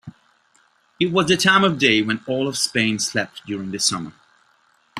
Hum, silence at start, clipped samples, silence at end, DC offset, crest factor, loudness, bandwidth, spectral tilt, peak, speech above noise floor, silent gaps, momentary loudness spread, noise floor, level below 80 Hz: none; 0.05 s; under 0.1%; 0 s; under 0.1%; 20 dB; -19 LUFS; 15.5 kHz; -3 dB/octave; -2 dBFS; 40 dB; none; 13 LU; -60 dBFS; -60 dBFS